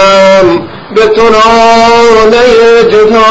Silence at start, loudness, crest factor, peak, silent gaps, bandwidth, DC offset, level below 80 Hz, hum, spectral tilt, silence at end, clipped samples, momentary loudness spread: 0 s; -4 LUFS; 4 dB; 0 dBFS; none; 9.2 kHz; under 0.1%; -30 dBFS; none; -4 dB/octave; 0 s; 5%; 5 LU